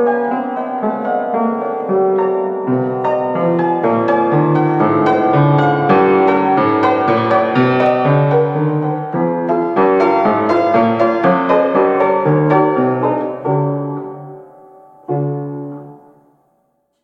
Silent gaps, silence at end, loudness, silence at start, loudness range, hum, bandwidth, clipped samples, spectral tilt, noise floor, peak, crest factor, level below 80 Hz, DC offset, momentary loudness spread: none; 1.1 s; -14 LUFS; 0 s; 6 LU; none; 6.8 kHz; under 0.1%; -9.5 dB/octave; -63 dBFS; -2 dBFS; 14 dB; -58 dBFS; under 0.1%; 8 LU